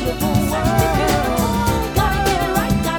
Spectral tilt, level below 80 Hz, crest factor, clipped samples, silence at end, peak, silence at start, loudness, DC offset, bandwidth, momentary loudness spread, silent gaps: -5 dB/octave; -26 dBFS; 14 dB; under 0.1%; 0 s; -2 dBFS; 0 s; -18 LUFS; under 0.1%; over 20 kHz; 2 LU; none